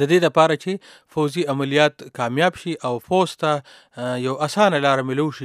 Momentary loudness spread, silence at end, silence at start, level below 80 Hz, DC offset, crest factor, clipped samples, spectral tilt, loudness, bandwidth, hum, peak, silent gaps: 11 LU; 0 s; 0 s; -64 dBFS; under 0.1%; 20 dB; under 0.1%; -5.5 dB/octave; -20 LUFS; 14.5 kHz; none; 0 dBFS; none